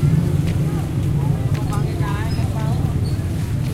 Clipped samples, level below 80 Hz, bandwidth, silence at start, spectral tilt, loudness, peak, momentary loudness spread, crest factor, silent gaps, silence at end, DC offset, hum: under 0.1%; -30 dBFS; 15.5 kHz; 0 s; -7.5 dB/octave; -21 LUFS; -6 dBFS; 3 LU; 12 dB; none; 0 s; under 0.1%; none